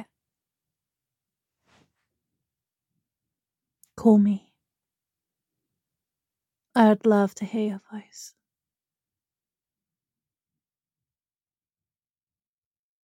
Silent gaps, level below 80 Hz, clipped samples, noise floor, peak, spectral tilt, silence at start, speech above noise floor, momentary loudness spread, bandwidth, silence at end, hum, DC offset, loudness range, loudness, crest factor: none; -72 dBFS; under 0.1%; under -90 dBFS; -4 dBFS; -7 dB/octave; 0 s; over 69 dB; 22 LU; 10.5 kHz; 4.75 s; none; under 0.1%; 6 LU; -22 LUFS; 24 dB